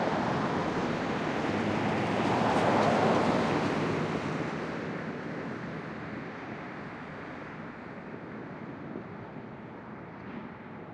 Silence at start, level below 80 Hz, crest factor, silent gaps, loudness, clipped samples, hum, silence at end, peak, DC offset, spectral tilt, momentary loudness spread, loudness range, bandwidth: 0 s; -60 dBFS; 18 dB; none; -31 LUFS; under 0.1%; none; 0 s; -12 dBFS; under 0.1%; -6.5 dB/octave; 17 LU; 14 LU; 11.5 kHz